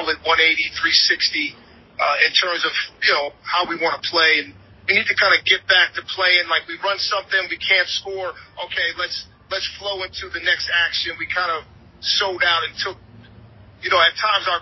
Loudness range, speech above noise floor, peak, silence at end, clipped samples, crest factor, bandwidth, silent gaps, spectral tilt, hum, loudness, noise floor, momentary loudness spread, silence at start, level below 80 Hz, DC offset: 5 LU; 25 dB; -2 dBFS; 0 s; under 0.1%; 20 dB; 6.2 kHz; none; -1.5 dB/octave; none; -18 LUFS; -45 dBFS; 12 LU; 0 s; -54 dBFS; under 0.1%